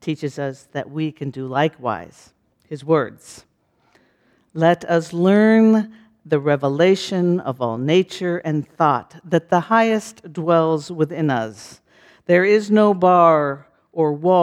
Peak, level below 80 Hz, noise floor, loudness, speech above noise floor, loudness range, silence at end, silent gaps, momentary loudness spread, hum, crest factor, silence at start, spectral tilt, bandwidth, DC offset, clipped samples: -2 dBFS; -66 dBFS; -60 dBFS; -18 LUFS; 42 dB; 7 LU; 0 s; none; 15 LU; none; 18 dB; 0.05 s; -7 dB/octave; 11.5 kHz; under 0.1%; under 0.1%